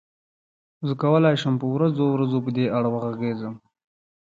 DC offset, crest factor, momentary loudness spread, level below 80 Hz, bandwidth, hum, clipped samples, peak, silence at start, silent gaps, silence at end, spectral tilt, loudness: under 0.1%; 18 dB; 11 LU; -66 dBFS; 7.6 kHz; none; under 0.1%; -6 dBFS; 0.8 s; none; 0.65 s; -8.5 dB/octave; -23 LUFS